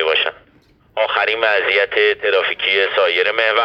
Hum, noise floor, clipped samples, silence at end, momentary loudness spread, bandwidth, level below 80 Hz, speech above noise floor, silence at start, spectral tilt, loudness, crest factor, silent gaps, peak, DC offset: none; -53 dBFS; under 0.1%; 0 s; 5 LU; 7.6 kHz; -58 dBFS; 37 dB; 0 s; -3 dB/octave; -16 LUFS; 16 dB; none; 0 dBFS; under 0.1%